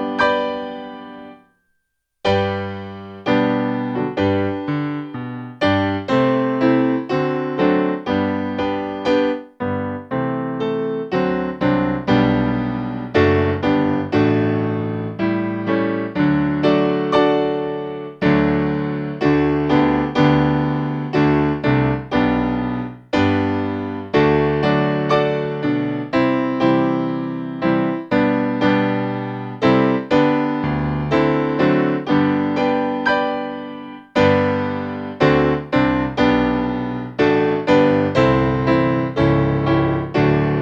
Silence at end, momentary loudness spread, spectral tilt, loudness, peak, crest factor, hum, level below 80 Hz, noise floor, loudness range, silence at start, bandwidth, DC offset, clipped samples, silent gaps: 0 s; 9 LU; -8 dB/octave; -18 LUFS; -2 dBFS; 16 dB; none; -42 dBFS; -71 dBFS; 4 LU; 0 s; 7.4 kHz; under 0.1%; under 0.1%; none